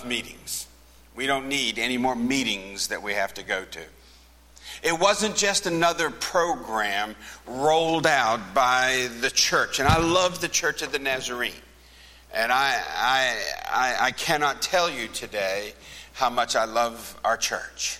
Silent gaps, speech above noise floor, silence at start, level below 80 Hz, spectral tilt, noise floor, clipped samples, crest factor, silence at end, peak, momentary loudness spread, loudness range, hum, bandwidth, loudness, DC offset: none; 28 dB; 0 s; -48 dBFS; -2.5 dB/octave; -52 dBFS; under 0.1%; 22 dB; 0 s; -4 dBFS; 10 LU; 5 LU; none; 16.5 kHz; -24 LUFS; under 0.1%